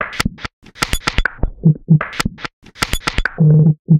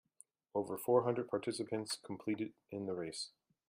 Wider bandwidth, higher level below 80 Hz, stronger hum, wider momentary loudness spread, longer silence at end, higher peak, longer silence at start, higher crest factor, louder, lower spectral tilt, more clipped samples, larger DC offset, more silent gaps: about the same, 15.5 kHz vs 15.5 kHz; first, -26 dBFS vs -80 dBFS; neither; first, 14 LU vs 11 LU; second, 0 s vs 0.4 s; first, 0 dBFS vs -18 dBFS; second, 0 s vs 0.55 s; second, 14 dB vs 22 dB; first, -16 LUFS vs -39 LUFS; about the same, -5.5 dB/octave vs -5 dB/octave; neither; neither; first, 0.53-0.62 s, 2.53-2.62 s, 3.79-3.85 s vs none